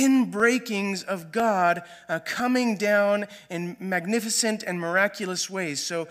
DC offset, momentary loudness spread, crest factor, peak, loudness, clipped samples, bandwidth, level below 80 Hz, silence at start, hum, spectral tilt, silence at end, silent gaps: under 0.1%; 9 LU; 18 dB; -8 dBFS; -25 LUFS; under 0.1%; 15.5 kHz; -74 dBFS; 0 s; none; -3.5 dB/octave; 0 s; none